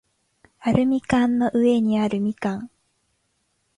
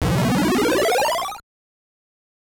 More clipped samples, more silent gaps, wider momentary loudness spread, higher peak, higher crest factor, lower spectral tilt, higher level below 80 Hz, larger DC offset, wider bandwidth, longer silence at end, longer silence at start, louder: neither; neither; about the same, 10 LU vs 11 LU; first, -4 dBFS vs -12 dBFS; first, 18 dB vs 10 dB; first, -7 dB/octave vs -5 dB/octave; second, -52 dBFS vs -40 dBFS; neither; second, 11 kHz vs over 20 kHz; about the same, 1.1 s vs 1 s; first, 0.6 s vs 0 s; about the same, -21 LUFS vs -19 LUFS